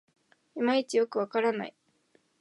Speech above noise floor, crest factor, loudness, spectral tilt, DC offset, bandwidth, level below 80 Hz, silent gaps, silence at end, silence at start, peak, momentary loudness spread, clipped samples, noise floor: 41 dB; 18 dB; -29 LUFS; -4.5 dB/octave; under 0.1%; 11.5 kHz; -88 dBFS; none; 0.7 s; 0.55 s; -14 dBFS; 13 LU; under 0.1%; -69 dBFS